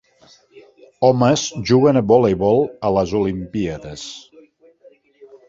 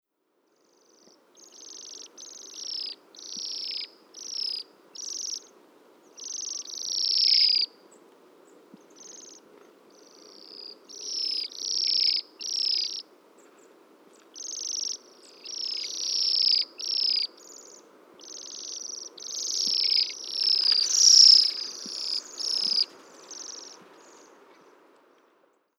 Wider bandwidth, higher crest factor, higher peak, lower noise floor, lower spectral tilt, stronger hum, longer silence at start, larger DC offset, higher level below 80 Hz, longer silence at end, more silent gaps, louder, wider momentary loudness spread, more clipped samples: second, 7.8 kHz vs 17.5 kHz; second, 18 dB vs 24 dB; about the same, -2 dBFS vs -4 dBFS; second, -52 dBFS vs -72 dBFS; first, -6 dB/octave vs 3.5 dB/octave; neither; second, 1 s vs 1.55 s; neither; first, -46 dBFS vs under -90 dBFS; second, 0.15 s vs 2.05 s; neither; first, -17 LUFS vs -23 LUFS; second, 17 LU vs 23 LU; neither